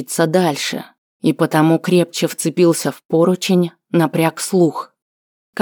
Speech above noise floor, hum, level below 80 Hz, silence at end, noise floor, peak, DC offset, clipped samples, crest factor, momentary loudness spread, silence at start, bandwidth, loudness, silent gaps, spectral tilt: over 74 dB; none; -70 dBFS; 0 s; under -90 dBFS; -2 dBFS; under 0.1%; under 0.1%; 14 dB; 7 LU; 0 s; over 20 kHz; -16 LUFS; 0.98-1.20 s, 3.05-3.09 s, 5.02-5.53 s; -5.5 dB/octave